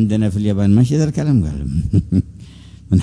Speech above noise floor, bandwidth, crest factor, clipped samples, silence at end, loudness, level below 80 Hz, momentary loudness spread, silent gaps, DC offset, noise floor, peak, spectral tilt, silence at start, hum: 23 dB; 11 kHz; 14 dB; under 0.1%; 0 s; -17 LUFS; -32 dBFS; 7 LU; none; under 0.1%; -38 dBFS; -2 dBFS; -8.5 dB/octave; 0 s; none